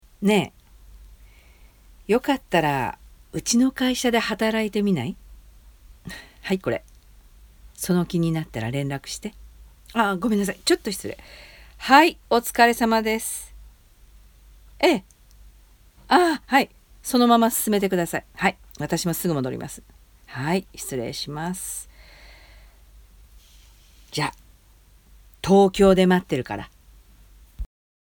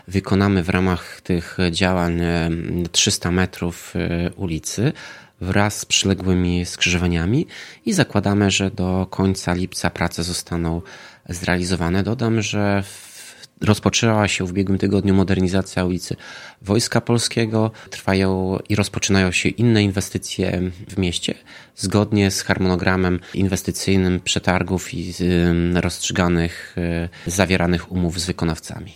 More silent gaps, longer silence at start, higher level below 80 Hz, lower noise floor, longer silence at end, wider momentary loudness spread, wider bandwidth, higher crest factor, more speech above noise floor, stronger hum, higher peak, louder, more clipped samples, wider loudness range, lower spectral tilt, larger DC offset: neither; about the same, 0.2 s vs 0.1 s; second, -48 dBFS vs -40 dBFS; first, -54 dBFS vs -41 dBFS; first, 0.4 s vs 0.05 s; first, 20 LU vs 9 LU; first, over 20 kHz vs 16 kHz; about the same, 24 dB vs 20 dB; first, 32 dB vs 21 dB; neither; about the same, 0 dBFS vs 0 dBFS; about the same, -22 LUFS vs -20 LUFS; neither; first, 10 LU vs 2 LU; about the same, -4.5 dB/octave vs -5 dB/octave; neither